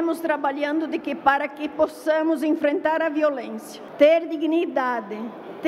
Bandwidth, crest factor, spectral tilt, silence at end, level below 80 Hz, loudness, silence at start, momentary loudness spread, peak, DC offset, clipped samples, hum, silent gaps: 14.5 kHz; 18 dB; -4.5 dB/octave; 0 s; -66 dBFS; -22 LUFS; 0 s; 14 LU; -6 dBFS; under 0.1%; under 0.1%; none; none